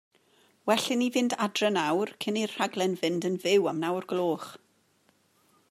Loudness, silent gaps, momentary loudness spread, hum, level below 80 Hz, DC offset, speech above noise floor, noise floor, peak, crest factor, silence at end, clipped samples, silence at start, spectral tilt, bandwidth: -28 LUFS; none; 6 LU; none; -80 dBFS; under 0.1%; 40 dB; -67 dBFS; -10 dBFS; 20 dB; 1.15 s; under 0.1%; 0.65 s; -4 dB/octave; 15.5 kHz